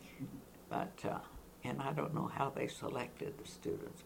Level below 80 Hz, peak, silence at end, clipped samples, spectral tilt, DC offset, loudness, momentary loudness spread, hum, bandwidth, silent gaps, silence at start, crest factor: -66 dBFS; -20 dBFS; 0 s; under 0.1%; -6 dB/octave; under 0.1%; -42 LUFS; 10 LU; none; 19 kHz; none; 0 s; 22 dB